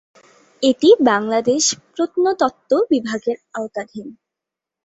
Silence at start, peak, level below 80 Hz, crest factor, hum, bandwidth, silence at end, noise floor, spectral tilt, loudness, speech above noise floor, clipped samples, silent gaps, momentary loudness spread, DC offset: 0.6 s; -2 dBFS; -64 dBFS; 16 dB; none; 8.2 kHz; 0.7 s; -85 dBFS; -3 dB/octave; -18 LUFS; 68 dB; under 0.1%; none; 15 LU; under 0.1%